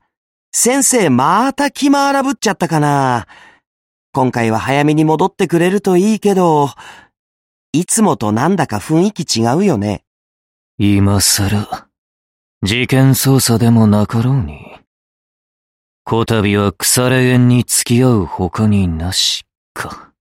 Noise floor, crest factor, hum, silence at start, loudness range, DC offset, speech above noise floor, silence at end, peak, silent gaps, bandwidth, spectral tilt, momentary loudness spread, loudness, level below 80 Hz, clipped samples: under -90 dBFS; 14 dB; none; 0.55 s; 3 LU; under 0.1%; over 77 dB; 0.2 s; 0 dBFS; 3.67-4.13 s, 7.19-7.73 s, 10.07-10.78 s, 11.98-12.61 s, 14.87-16.05 s, 19.57-19.75 s; 16.5 kHz; -4.5 dB/octave; 9 LU; -13 LUFS; -42 dBFS; under 0.1%